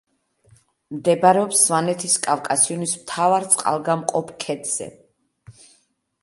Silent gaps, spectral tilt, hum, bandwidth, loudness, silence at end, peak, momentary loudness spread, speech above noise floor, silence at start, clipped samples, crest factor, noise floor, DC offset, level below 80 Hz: none; -3 dB/octave; none; 12 kHz; -19 LUFS; 0.7 s; 0 dBFS; 11 LU; 43 dB; 0.9 s; under 0.1%; 22 dB; -63 dBFS; under 0.1%; -68 dBFS